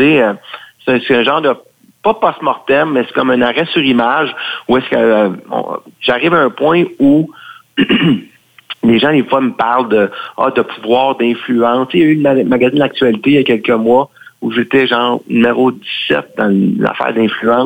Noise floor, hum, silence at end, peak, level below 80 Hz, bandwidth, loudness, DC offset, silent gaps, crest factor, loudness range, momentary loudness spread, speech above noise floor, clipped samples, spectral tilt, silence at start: -32 dBFS; none; 0 s; 0 dBFS; -52 dBFS; 17 kHz; -12 LUFS; under 0.1%; none; 12 dB; 2 LU; 7 LU; 20 dB; under 0.1%; -7.5 dB/octave; 0 s